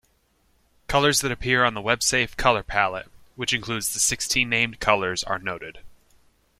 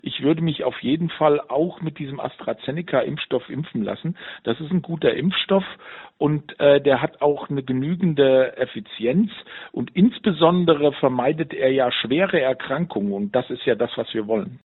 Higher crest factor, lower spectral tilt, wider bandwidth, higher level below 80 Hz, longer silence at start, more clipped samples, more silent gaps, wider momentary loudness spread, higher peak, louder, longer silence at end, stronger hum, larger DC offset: about the same, 22 dB vs 18 dB; second, -2 dB/octave vs -5 dB/octave; first, 16.5 kHz vs 4.2 kHz; first, -46 dBFS vs -60 dBFS; first, 0.9 s vs 0.05 s; neither; neither; second, 9 LU vs 12 LU; about the same, -2 dBFS vs -2 dBFS; about the same, -22 LUFS vs -22 LUFS; first, 0.65 s vs 0.15 s; neither; neither